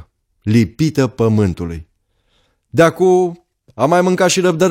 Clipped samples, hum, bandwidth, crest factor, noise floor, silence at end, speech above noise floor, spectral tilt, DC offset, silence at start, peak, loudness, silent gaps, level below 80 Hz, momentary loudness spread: under 0.1%; none; 16 kHz; 14 dB; -62 dBFS; 0 s; 48 dB; -5.5 dB/octave; under 0.1%; 0.45 s; 0 dBFS; -15 LUFS; none; -44 dBFS; 11 LU